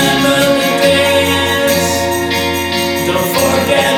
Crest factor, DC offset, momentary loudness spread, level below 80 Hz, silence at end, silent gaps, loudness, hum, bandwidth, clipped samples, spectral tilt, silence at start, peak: 12 dB; under 0.1%; 4 LU; -38 dBFS; 0 s; none; -12 LUFS; none; over 20 kHz; under 0.1%; -3.5 dB/octave; 0 s; 0 dBFS